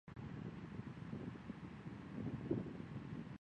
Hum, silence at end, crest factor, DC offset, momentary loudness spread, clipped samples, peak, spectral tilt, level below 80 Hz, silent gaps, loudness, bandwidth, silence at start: none; 0.05 s; 20 dB; under 0.1%; 8 LU; under 0.1%; -28 dBFS; -8.5 dB/octave; -66 dBFS; none; -49 LUFS; 9.6 kHz; 0.05 s